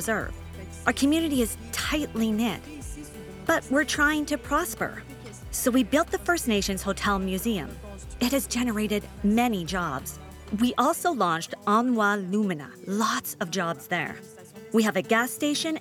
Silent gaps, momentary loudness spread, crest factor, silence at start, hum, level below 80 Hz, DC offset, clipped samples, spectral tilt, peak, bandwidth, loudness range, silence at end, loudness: none; 16 LU; 22 dB; 0 s; none; -46 dBFS; under 0.1%; under 0.1%; -4 dB/octave; -6 dBFS; 18 kHz; 2 LU; 0 s; -26 LUFS